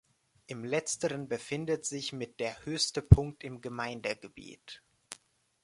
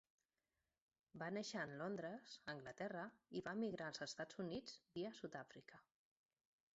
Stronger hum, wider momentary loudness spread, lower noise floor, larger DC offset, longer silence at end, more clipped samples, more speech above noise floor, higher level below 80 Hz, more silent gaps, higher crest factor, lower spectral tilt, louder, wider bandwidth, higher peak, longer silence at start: neither; first, 25 LU vs 8 LU; second, -60 dBFS vs under -90 dBFS; neither; second, 0.5 s vs 0.95 s; neither; second, 28 dB vs over 40 dB; first, -42 dBFS vs -84 dBFS; neither; first, 30 dB vs 18 dB; about the same, -5 dB/octave vs -4 dB/octave; first, -31 LUFS vs -50 LUFS; first, 11.5 kHz vs 8 kHz; first, -2 dBFS vs -34 dBFS; second, 0.5 s vs 1.15 s